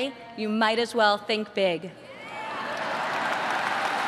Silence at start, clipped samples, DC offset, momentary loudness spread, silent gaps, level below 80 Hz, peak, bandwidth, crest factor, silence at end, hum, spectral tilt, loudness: 0 s; under 0.1%; under 0.1%; 12 LU; none; -72 dBFS; -8 dBFS; 13.5 kHz; 18 dB; 0 s; none; -3.5 dB/octave; -26 LUFS